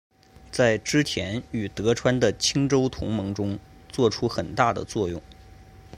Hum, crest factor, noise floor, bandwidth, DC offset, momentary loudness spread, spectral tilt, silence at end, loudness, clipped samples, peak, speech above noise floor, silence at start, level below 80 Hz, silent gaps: none; 20 dB; -48 dBFS; 16 kHz; under 0.1%; 10 LU; -5 dB/octave; 0 s; -25 LUFS; under 0.1%; -4 dBFS; 24 dB; 0.5 s; -48 dBFS; none